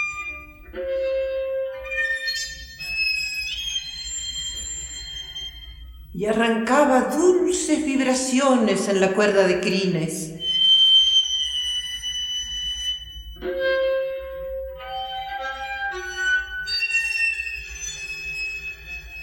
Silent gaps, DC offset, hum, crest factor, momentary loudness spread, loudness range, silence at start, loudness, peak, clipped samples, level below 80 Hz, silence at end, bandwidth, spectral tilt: none; under 0.1%; none; 18 dB; 14 LU; 9 LU; 0 s; -22 LUFS; -6 dBFS; under 0.1%; -46 dBFS; 0 s; 17 kHz; -2.5 dB/octave